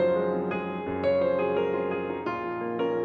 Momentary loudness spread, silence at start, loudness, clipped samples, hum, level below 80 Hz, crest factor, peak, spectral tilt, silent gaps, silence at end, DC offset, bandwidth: 6 LU; 0 s; -28 LUFS; under 0.1%; none; -62 dBFS; 12 dB; -14 dBFS; -8.5 dB/octave; none; 0 s; under 0.1%; 5 kHz